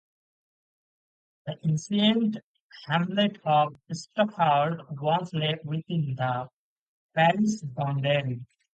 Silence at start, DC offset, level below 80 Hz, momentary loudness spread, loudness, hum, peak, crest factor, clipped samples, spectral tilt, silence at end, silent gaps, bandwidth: 1.45 s; under 0.1%; -70 dBFS; 13 LU; -26 LUFS; none; -8 dBFS; 20 dB; under 0.1%; -6 dB/octave; 0.3 s; 2.43-2.54 s, 2.60-2.69 s, 6.53-7.09 s; 9 kHz